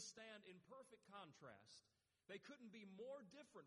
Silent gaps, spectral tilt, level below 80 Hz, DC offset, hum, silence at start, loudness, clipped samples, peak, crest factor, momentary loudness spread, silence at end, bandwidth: none; -3 dB/octave; under -90 dBFS; under 0.1%; none; 0 s; -61 LUFS; under 0.1%; -44 dBFS; 18 dB; 8 LU; 0 s; 11.5 kHz